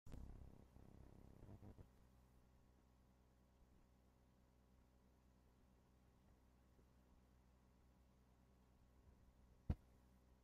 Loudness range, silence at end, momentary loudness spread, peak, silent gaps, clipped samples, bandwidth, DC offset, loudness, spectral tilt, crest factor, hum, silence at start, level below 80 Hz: 8 LU; 0 s; 15 LU; -30 dBFS; none; under 0.1%; 8 kHz; under 0.1%; -59 LUFS; -8.5 dB/octave; 32 dB; none; 0.05 s; -68 dBFS